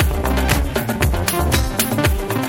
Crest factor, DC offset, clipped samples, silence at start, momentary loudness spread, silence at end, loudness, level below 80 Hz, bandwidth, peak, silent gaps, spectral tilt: 18 dB; under 0.1%; under 0.1%; 0 s; 2 LU; 0 s; -18 LUFS; -22 dBFS; 17 kHz; 0 dBFS; none; -4.5 dB/octave